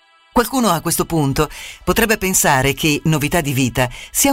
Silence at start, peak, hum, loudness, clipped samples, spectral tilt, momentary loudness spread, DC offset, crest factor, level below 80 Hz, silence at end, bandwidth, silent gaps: 0.35 s; -2 dBFS; none; -17 LUFS; under 0.1%; -4 dB/octave; 7 LU; under 0.1%; 16 dB; -36 dBFS; 0 s; 16.5 kHz; none